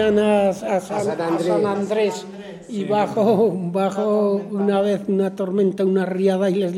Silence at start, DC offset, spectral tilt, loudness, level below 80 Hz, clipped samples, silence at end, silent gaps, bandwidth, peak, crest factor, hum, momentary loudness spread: 0 s; under 0.1%; -7 dB/octave; -20 LUFS; -58 dBFS; under 0.1%; 0 s; none; 13 kHz; -6 dBFS; 12 dB; none; 6 LU